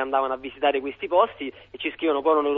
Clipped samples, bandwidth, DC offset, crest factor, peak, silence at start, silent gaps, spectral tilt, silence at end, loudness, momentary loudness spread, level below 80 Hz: under 0.1%; 4.2 kHz; under 0.1%; 18 dB; -6 dBFS; 0 s; none; -7.5 dB/octave; 0 s; -24 LUFS; 10 LU; -62 dBFS